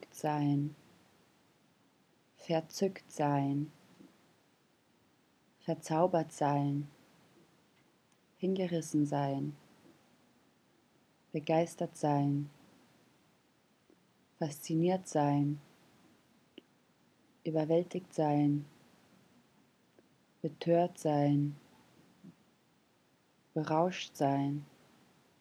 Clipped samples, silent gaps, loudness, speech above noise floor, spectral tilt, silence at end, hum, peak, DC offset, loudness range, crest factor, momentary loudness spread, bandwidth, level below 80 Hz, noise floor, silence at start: under 0.1%; none; -34 LUFS; 38 dB; -7 dB/octave; 0.75 s; none; -16 dBFS; under 0.1%; 2 LU; 22 dB; 12 LU; 13 kHz; -86 dBFS; -71 dBFS; 0 s